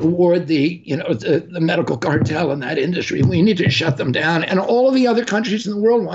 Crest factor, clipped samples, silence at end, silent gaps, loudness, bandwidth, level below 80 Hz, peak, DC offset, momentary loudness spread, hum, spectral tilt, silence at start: 10 dB; under 0.1%; 0 s; none; -17 LUFS; 8 kHz; -54 dBFS; -6 dBFS; under 0.1%; 5 LU; none; -6.5 dB/octave; 0 s